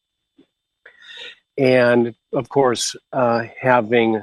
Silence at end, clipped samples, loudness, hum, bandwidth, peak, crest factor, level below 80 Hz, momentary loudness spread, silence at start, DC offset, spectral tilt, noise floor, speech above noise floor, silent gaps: 0 s; under 0.1%; -18 LUFS; none; 12.5 kHz; -2 dBFS; 18 dB; -64 dBFS; 20 LU; 1.1 s; under 0.1%; -4.5 dB/octave; -59 dBFS; 41 dB; none